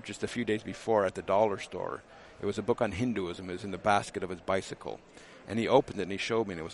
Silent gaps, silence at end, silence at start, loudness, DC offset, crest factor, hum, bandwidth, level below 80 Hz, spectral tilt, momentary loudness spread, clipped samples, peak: none; 0 s; 0 s; -31 LUFS; under 0.1%; 24 dB; none; 11.5 kHz; -60 dBFS; -5.5 dB/octave; 12 LU; under 0.1%; -8 dBFS